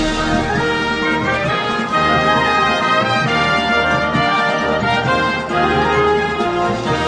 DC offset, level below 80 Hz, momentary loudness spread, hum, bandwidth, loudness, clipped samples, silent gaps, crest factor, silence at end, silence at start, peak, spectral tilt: under 0.1%; -36 dBFS; 4 LU; none; 10.5 kHz; -15 LUFS; under 0.1%; none; 14 dB; 0 s; 0 s; -2 dBFS; -5 dB/octave